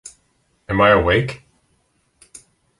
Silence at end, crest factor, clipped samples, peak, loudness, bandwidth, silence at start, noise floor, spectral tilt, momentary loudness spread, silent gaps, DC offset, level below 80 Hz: 1.45 s; 20 dB; under 0.1%; -2 dBFS; -16 LUFS; 11.5 kHz; 0.05 s; -64 dBFS; -5.5 dB/octave; 16 LU; none; under 0.1%; -40 dBFS